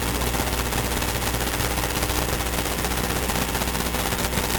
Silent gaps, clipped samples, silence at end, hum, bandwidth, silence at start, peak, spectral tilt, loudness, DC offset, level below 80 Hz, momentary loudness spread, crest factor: none; under 0.1%; 0 s; none; 19.5 kHz; 0 s; -6 dBFS; -3.5 dB/octave; -24 LUFS; under 0.1%; -30 dBFS; 1 LU; 18 dB